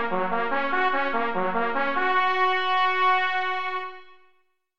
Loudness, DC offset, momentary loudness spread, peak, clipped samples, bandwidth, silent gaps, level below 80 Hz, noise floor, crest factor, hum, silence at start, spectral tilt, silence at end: -24 LUFS; 2%; 6 LU; -10 dBFS; under 0.1%; 7 kHz; none; -60 dBFS; -67 dBFS; 14 dB; none; 0 s; -5 dB/octave; 0 s